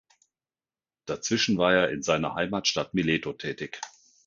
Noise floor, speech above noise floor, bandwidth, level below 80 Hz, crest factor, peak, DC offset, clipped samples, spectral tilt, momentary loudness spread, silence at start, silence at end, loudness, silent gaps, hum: under -90 dBFS; over 63 dB; 7.6 kHz; -58 dBFS; 20 dB; -8 dBFS; under 0.1%; under 0.1%; -4 dB/octave; 14 LU; 1.05 s; 0.4 s; -26 LUFS; none; none